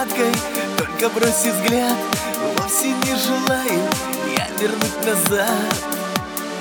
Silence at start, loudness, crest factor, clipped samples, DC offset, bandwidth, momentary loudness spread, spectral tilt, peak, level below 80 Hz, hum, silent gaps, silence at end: 0 s; -19 LUFS; 18 dB; under 0.1%; under 0.1%; over 20 kHz; 5 LU; -3 dB/octave; -2 dBFS; -50 dBFS; none; none; 0 s